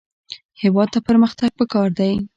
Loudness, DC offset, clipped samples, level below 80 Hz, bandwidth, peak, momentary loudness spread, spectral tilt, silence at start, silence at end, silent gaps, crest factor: -18 LUFS; under 0.1%; under 0.1%; -50 dBFS; 7.6 kHz; -4 dBFS; 21 LU; -7.5 dB/octave; 0.3 s; 0.1 s; 0.45-0.49 s; 14 dB